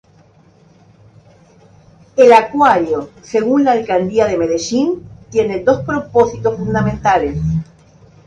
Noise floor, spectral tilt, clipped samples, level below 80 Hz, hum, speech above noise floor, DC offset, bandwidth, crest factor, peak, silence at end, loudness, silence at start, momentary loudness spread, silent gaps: -48 dBFS; -6 dB/octave; under 0.1%; -40 dBFS; none; 35 dB; under 0.1%; 9.4 kHz; 16 dB; 0 dBFS; 0.65 s; -14 LUFS; 2.15 s; 11 LU; none